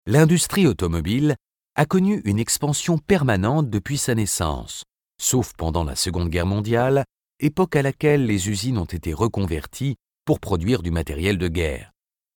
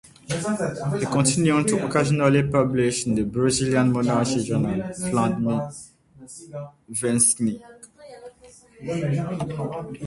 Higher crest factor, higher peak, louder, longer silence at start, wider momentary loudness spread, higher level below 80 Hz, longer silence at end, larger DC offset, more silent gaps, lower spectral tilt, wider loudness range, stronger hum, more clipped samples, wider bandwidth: about the same, 18 dB vs 20 dB; about the same, -2 dBFS vs -4 dBFS; about the same, -22 LUFS vs -22 LUFS; second, 0.05 s vs 0.3 s; second, 9 LU vs 18 LU; first, -38 dBFS vs -52 dBFS; first, 0.55 s vs 0 s; neither; neither; about the same, -5 dB/octave vs -5 dB/octave; about the same, 3 LU vs 5 LU; neither; neither; first, 19.5 kHz vs 11.5 kHz